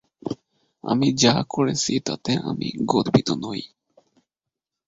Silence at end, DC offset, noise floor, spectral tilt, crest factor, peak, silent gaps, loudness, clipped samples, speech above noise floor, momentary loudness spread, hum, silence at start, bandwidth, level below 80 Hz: 1.2 s; under 0.1%; -86 dBFS; -4.5 dB/octave; 22 dB; -2 dBFS; none; -22 LUFS; under 0.1%; 65 dB; 15 LU; none; 0.25 s; 8 kHz; -56 dBFS